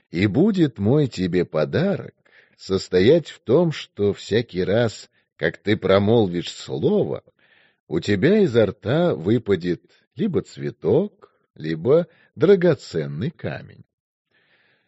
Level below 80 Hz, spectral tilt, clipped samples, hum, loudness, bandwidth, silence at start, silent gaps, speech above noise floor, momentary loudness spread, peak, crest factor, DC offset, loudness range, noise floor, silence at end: -58 dBFS; -6 dB/octave; under 0.1%; none; -21 LUFS; 8 kHz; 0.15 s; 7.80-7.87 s, 10.07-10.11 s, 11.50-11.54 s; 42 dB; 13 LU; -2 dBFS; 20 dB; under 0.1%; 2 LU; -62 dBFS; 1.05 s